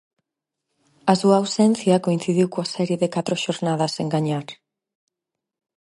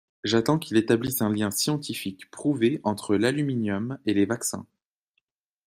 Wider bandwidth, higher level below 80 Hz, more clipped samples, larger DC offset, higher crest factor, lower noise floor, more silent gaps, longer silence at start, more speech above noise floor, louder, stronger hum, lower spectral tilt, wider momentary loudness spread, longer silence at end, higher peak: second, 11.5 kHz vs 16 kHz; second, -68 dBFS vs -62 dBFS; neither; neither; about the same, 20 dB vs 20 dB; first, -85 dBFS vs -77 dBFS; neither; first, 1.05 s vs 0.25 s; first, 64 dB vs 52 dB; first, -21 LUFS vs -25 LUFS; neither; about the same, -6 dB/octave vs -5 dB/octave; about the same, 8 LU vs 7 LU; first, 1.3 s vs 1 s; first, -2 dBFS vs -6 dBFS